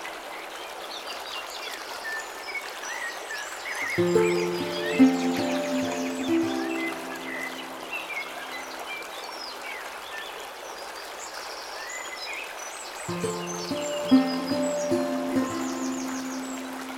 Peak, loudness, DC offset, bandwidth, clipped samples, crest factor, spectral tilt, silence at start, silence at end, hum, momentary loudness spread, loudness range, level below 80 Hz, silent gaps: -8 dBFS; -29 LUFS; under 0.1%; 16.5 kHz; under 0.1%; 22 dB; -4 dB/octave; 0 s; 0 s; none; 13 LU; 10 LU; -66 dBFS; none